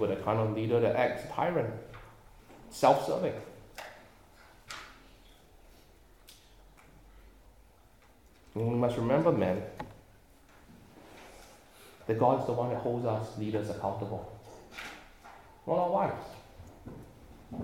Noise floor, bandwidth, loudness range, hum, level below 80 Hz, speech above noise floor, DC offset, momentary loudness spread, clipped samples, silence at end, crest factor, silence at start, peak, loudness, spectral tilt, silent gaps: -61 dBFS; 17 kHz; 19 LU; none; -60 dBFS; 31 dB; under 0.1%; 24 LU; under 0.1%; 0 s; 24 dB; 0 s; -10 dBFS; -31 LUFS; -7 dB/octave; none